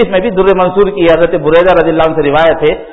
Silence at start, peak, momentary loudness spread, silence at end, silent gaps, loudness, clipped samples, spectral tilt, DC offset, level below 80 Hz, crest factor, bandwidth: 0 s; 0 dBFS; 3 LU; 0 s; none; -9 LUFS; 0.4%; -8 dB/octave; under 0.1%; -32 dBFS; 8 dB; 5.8 kHz